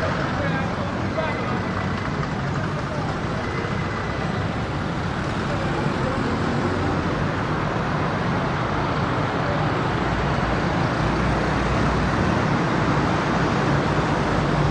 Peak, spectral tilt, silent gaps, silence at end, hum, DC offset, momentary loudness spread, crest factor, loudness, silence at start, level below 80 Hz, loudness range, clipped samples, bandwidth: -8 dBFS; -6.5 dB/octave; none; 0 s; none; under 0.1%; 5 LU; 14 dB; -23 LUFS; 0 s; -36 dBFS; 4 LU; under 0.1%; 10.5 kHz